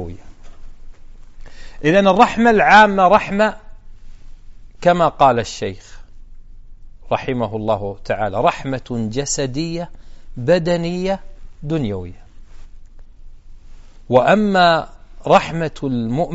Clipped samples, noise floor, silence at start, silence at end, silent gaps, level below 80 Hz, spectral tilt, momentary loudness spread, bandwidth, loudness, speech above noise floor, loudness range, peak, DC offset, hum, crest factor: under 0.1%; -37 dBFS; 0 s; 0 s; none; -36 dBFS; -4 dB/octave; 15 LU; 8 kHz; -16 LUFS; 21 dB; 9 LU; 0 dBFS; under 0.1%; none; 18 dB